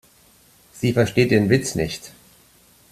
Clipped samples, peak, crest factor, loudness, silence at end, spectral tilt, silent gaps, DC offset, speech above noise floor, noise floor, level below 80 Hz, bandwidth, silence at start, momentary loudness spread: under 0.1%; -2 dBFS; 20 dB; -20 LUFS; 0.85 s; -5.5 dB/octave; none; under 0.1%; 35 dB; -54 dBFS; -50 dBFS; 14.5 kHz; 0.75 s; 14 LU